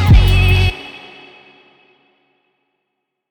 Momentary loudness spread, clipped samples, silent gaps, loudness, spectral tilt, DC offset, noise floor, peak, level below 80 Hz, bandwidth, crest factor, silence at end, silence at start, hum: 24 LU; under 0.1%; none; -13 LUFS; -6 dB/octave; under 0.1%; -75 dBFS; 0 dBFS; -20 dBFS; 19 kHz; 16 dB; 2.35 s; 0 s; none